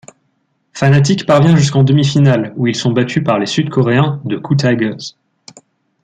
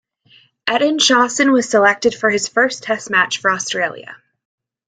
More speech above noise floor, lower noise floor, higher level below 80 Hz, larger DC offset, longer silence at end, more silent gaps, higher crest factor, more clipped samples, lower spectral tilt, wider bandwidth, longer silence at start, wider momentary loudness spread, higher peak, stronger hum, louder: first, 51 dB vs 36 dB; first, -63 dBFS vs -52 dBFS; first, -50 dBFS vs -62 dBFS; neither; first, 0.95 s vs 0.7 s; neither; about the same, 12 dB vs 16 dB; neither; first, -6.5 dB/octave vs -2 dB/octave; about the same, 9 kHz vs 9.6 kHz; about the same, 0.75 s vs 0.65 s; about the same, 8 LU vs 9 LU; about the same, 0 dBFS vs -2 dBFS; neither; about the same, -13 LUFS vs -15 LUFS